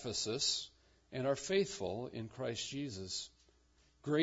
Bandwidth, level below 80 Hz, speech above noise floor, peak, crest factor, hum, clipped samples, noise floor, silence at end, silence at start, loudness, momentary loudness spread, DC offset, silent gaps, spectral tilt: 8 kHz; -70 dBFS; 32 dB; -20 dBFS; 20 dB; none; under 0.1%; -71 dBFS; 0 s; 0 s; -38 LUFS; 13 LU; under 0.1%; none; -3.5 dB/octave